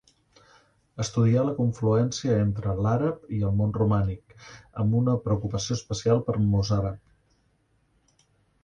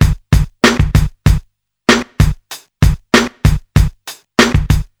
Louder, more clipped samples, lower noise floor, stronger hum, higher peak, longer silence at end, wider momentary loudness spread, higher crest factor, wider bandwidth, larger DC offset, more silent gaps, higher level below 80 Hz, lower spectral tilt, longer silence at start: second, -26 LUFS vs -14 LUFS; neither; first, -68 dBFS vs -39 dBFS; neither; second, -10 dBFS vs 0 dBFS; first, 1.65 s vs 0.2 s; about the same, 8 LU vs 7 LU; about the same, 16 dB vs 12 dB; second, 8.4 kHz vs 20 kHz; neither; neither; second, -46 dBFS vs -18 dBFS; first, -7 dB/octave vs -5.5 dB/octave; first, 0.95 s vs 0 s